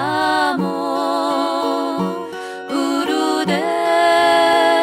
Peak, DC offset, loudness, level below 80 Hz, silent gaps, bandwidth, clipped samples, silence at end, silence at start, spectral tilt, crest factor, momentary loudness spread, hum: -4 dBFS; under 0.1%; -17 LUFS; -60 dBFS; none; 16 kHz; under 0.1%; 0 s; 0 s; -4 dB/octave; 12 dB; 10 LU; none